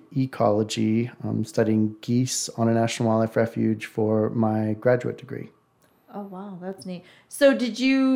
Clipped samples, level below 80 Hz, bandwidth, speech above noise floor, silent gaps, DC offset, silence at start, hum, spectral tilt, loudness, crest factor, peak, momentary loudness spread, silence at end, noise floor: under 0.1%; -66 dBFS; 16 kHz; 39 dB; none; under 0.1%; 0.1 s; none; -5.5 dB/octave; -23 LUFS; 18 dB; -6 dBFS; 16 LU; 0 s; -62 dBFS